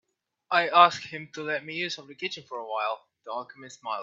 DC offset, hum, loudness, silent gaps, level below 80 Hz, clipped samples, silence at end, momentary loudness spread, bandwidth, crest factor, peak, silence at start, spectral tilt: under 0.1%; none; -27 LUFS; none; -80 dBFS; under 0.1%; 0 s; 18 LU; 7.8 kHz; 24 dB; -4 dBFS; 0.5 s; -3 dB/octave